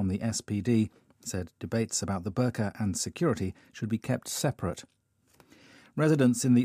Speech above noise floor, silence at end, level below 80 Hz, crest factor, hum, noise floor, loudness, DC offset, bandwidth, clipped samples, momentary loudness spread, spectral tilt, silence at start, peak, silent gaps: 35 dB; 0 s; -64 dBFS; 18 dB; none; -64 dBFS; -30 LUFS; under 0.1%; 15.5 kHz; under 0.1%; 13 LU; -5.5 dB/octave; 0 s; -12 dBFS; none